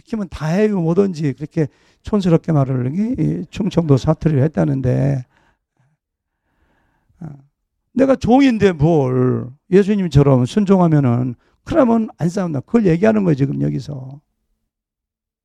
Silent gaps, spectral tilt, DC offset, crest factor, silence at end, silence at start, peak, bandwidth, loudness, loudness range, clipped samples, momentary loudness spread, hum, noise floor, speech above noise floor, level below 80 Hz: none; -8.5 dB/octave; under 0.1%; 16 dB; 1.25 s; 0.1 s; 0 dBFS; 9.8 kHz; -16 LUFS; 7 LU; under 0.1%; 12 LU; none; -84 dBFS; 69 dB; -42 dBFS